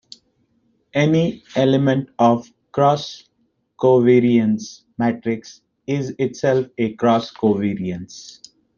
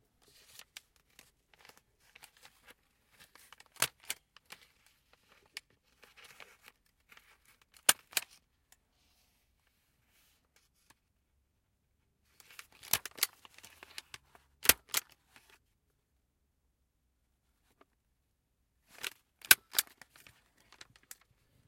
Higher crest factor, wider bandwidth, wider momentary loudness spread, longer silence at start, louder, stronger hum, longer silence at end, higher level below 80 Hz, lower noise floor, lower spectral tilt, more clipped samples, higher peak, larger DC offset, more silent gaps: second, 16 dB vs 40 dB; second, 7.2 kHz vs 16.5 kHz; second, 16 LU vs 29 LU; second, 0.95 s vs 3.8 s; first, -19 LUFS vs -31 LUFS; neither; second, 0.45 s vs 1.85 s; first, -60 dBFS vs -72 dBFS; second, -67 dBFS vs -79 dBFS; first, -7 dB/octave vs 1 dB/octave; neither; about the same, -2 dBFS vs -2 dBFS; neither; neither